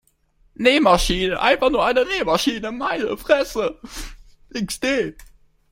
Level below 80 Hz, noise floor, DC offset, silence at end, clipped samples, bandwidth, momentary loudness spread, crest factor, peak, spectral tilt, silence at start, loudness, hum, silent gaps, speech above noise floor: -38 dBFS; -59 dBFS; under 0.1%; 0.5 s; under 0.1%; 16.5 kHz; 15 LU; 20 dB; -2 dBFS; -3.5 dB/octave; 0.6 s; -20 LUFS; none; none; 40 dB